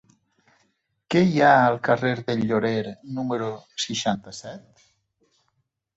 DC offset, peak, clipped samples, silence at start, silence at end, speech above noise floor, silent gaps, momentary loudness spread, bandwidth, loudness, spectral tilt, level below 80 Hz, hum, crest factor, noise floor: under 0.1%; -4 dBFS; under 0.1%; 1.1 s; 1.35 s; 51 dB; none; 18 LU; 8.2 kHz; -22 LUFS; -5.5 dB/octave; -64 dBFS; none; 20 dB; -74 dBFS